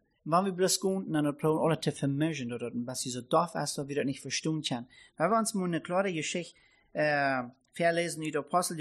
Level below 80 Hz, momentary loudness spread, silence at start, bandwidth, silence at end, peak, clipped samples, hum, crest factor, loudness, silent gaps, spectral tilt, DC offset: -72 dBFS; 8 LU; 0.25 s; 13.5 kHz; 0 s; -14 dBFS; under 0.1%; none; 18 dB; -31 LUFS; none; -4.5 dB/octave; under 0.1%